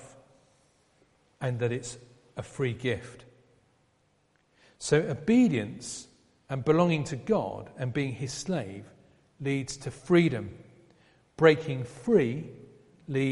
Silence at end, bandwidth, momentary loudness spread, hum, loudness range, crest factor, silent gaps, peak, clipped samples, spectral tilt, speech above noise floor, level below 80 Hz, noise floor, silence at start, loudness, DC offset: 0 s; 11.5 kHz; 19 LU; none; 8 LU; 24 dB; none; -6 dBFS; under 0.1%; -6 dB/octave; 41 dB; -62 dBFS; -69 dBFS; 0 s; -28 LUFS; under 0.1%